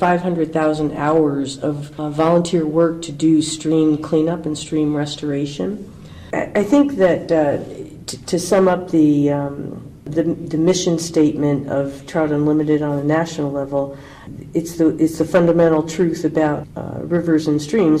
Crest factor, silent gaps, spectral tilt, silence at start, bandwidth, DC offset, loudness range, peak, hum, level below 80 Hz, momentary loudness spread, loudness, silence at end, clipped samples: 14 dB; none; -6 dB/octave; 0 s; 13 kHz; under 0.1%; 2 LU; -4 dBFS; none; -48 dBFS; 11 LU; -18 LUFS; 0 s; under 0.1%